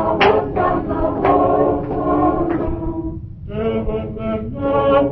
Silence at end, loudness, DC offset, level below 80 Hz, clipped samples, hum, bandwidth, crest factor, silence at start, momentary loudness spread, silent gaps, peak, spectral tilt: 0 s; -18 LUFS; under 0.1%; -32 dBFS; under 0.1%; none; 6 kHz; 16 dB; 0 s; 10 LU; none; -2 dBFS; -9 dB/octave